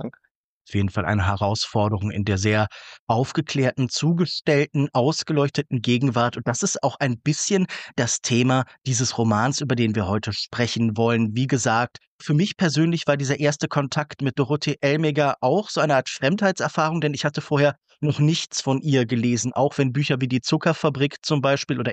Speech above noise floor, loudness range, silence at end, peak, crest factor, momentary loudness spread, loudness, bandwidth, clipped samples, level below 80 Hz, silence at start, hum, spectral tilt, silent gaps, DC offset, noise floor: 47 dB; 1 LU; 0 s; -8 dBFS; 14 dB; 4 LU; -22 LUFS; 9 kHz; under 0.1%; -56 dBFS; 0 s; none; -5 dB/octave; 0.31-0.65 s, 2.99-3.07 s, 12.07-12.19 s; under 0.1%; -68 dBFS